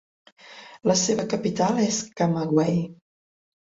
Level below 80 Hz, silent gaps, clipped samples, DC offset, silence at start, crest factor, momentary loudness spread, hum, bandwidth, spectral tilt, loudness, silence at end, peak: -62 dBFS; none; under 0.1%; under 0.1%; 0.45 s; 18 dB; 10 LU; none; 8 kHz; -5 dB/octave; -23 LUFS; 0.75 s; -6 dBFS